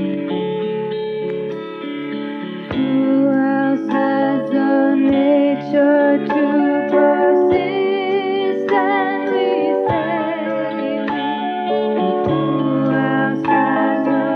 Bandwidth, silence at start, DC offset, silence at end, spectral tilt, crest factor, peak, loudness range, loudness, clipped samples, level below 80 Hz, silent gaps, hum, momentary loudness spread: 5 kHz; 0 s; under 0.1%; 0 s; -8.5 dB/octave; 14 dB; -4 dBFS; 4 LU; -17 LUFS; under 0.1%; -56 dBFS; none; none; 9 LU